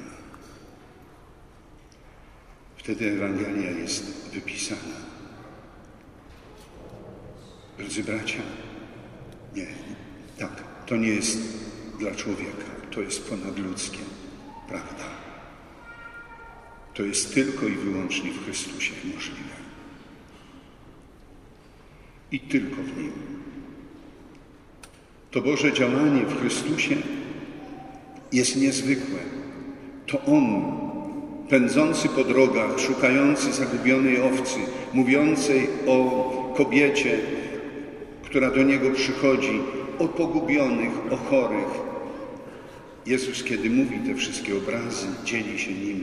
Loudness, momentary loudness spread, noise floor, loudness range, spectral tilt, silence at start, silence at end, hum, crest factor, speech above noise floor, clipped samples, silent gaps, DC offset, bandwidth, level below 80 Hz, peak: -25 LUFS; 23 LU; -50 dBFS; 14 LU; -4 dB/octave; 0 s; 0 s; none; 22 dB; 26 dB; under 0.1%; none; under 0.1%; 12 kHz; -54 dBFS; -4 dBFS